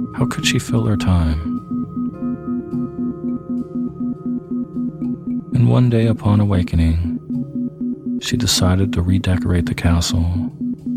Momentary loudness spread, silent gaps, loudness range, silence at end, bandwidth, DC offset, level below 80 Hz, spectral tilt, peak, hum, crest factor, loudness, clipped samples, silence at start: 10 LU; none; 6 LU; 0 s; 15.5 kHz; under 0.1%; -32 dBFS; -6 dB/octave; -2 dBFS; none; 16 dB; -19 LUFS; under 0.1%; 0 s